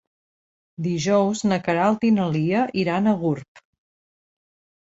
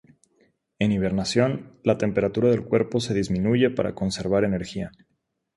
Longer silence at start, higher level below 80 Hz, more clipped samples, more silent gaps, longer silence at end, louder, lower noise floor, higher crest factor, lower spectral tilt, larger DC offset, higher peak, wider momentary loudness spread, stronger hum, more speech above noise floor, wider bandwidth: about the same, 0.8 s vs 0.8 s; second, -60 dBFS vs -50 dBFS; neither; first, 3.48-3.55 s vs none; first, 1.25 s vs 0.7 s; about the same, -22 LUFS vs -24 LUFS; first, under -90 dBFS vs -75 dBFS; about the same, 16 dB vs 18 dB; about the same, -6.5 dB/octave vs -6.5 dB/octave; neither; about the same, -6 dBFS vs -6 dBFS; about the same, 7 LU vs 6 LU; neither; first, over 69 dB vs 52 dB; second, 8 kHz vs 11.5 kHz